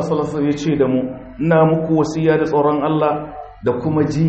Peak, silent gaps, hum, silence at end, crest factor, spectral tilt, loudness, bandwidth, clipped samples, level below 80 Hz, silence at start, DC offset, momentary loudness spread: -2 dBFS; none; none; 0 s; 14 dB; -8 dB/octave; -17 LUFS; 8.4 kHz; under 0.1%; -46 dBFS; 0 s; under 0.1%; 9 LU